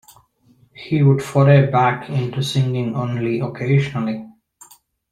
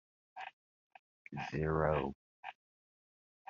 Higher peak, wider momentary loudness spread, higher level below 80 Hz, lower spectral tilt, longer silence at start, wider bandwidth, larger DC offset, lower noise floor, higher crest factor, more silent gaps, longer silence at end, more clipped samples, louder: first, -2 dBFS vs -18 dBFS; second, 11 LU vs 18 LU; about the same, -54 dBFS vs -58 dBFS; first, -7.5 dB/octave vs -6 dB/octave; first, 0.75 s vs 0.35 s; first, 12 kHz vs 7 kHz; neither; second, -56 dBFS vs under -90 dBFS; second, 16 dB vs 22 dB; second, none vs 0.53-0.90 s, 0.99-1.25 s, 2.15-2.43 s; second, 0.8 s vs 0.95 s; neither; first, -18 LUFS vs -37 LUFS